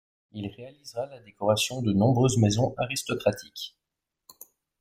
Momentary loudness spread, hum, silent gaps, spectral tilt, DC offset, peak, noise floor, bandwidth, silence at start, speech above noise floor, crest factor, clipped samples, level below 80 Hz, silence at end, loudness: 17 LU; none; none; -5.5 dB/octave; under 0.1%; -8 dBFS; -86 dBFS; 16 kHz; 0.35 s; 60 dB; 20 dB; under 0.1%; -58 dBFS; 1.15 s; -26 LUFS